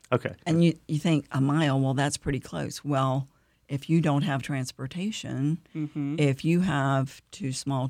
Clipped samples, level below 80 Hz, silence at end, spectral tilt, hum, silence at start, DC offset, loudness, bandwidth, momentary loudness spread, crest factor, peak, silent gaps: under 0.1%; -56 dBFS; 0 s; -6 dB/octave; none; 0.1 s; under 0.1%; -27 LUFS; 13.5 kHz; 10 LU; 18 dB; -10 dBFS; none